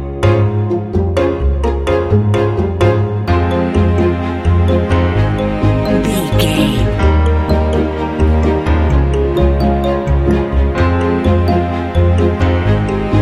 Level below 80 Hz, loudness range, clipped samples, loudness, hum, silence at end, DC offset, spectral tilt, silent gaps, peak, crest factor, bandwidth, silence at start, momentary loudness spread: -18 dBFS; 1 LU; under 0.1%; -14 LUFS; none; 0 s; under 0.1%; -7.5 dB/octave; none; 0 dBFS; 12 dB; 13.5 kHz; 0 s; 3 LU